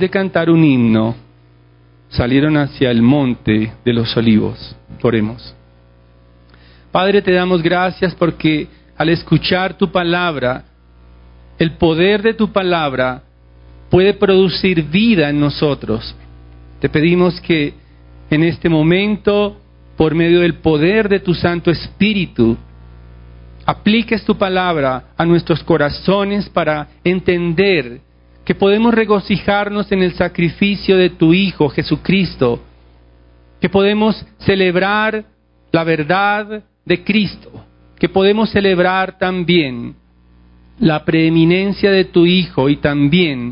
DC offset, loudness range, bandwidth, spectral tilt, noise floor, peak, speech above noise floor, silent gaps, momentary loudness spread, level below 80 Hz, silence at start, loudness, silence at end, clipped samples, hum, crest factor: under 0.1%; 3 LU; 5.4 kHz; -11.5 dB/octave; -48 dBFS; 0 dBFS; 34 dB; none; 8 LU; -40 dBFS; 0 s; -14 LUFS; 0 s; under 0.1%; 60 Hz at -40 dBFS; 14 dB